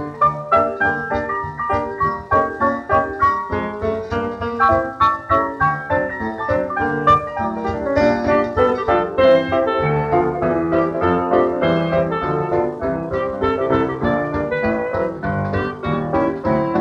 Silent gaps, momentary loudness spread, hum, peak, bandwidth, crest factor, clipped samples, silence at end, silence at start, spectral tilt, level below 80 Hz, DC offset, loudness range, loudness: none; 7 LU; none; -2 dBFS; 8.4 kHz; 16 dB; under 0.1%; 0 s; 0 s; -8 dB/octave; -42 dBFS; under 0.1%; 3 LU; -19 LUFS